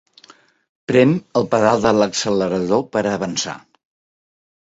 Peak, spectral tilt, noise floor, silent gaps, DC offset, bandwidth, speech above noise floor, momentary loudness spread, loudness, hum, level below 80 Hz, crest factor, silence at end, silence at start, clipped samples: -2 dBFS; -5 dB/octave; -50 dBFS; none; under 0.1%; 8 kHz; 33 dB; 9 LU; -18 LUFS; none; -54 dBFS; 18 dB; 1.1 s; 0.9 s; under 0.1%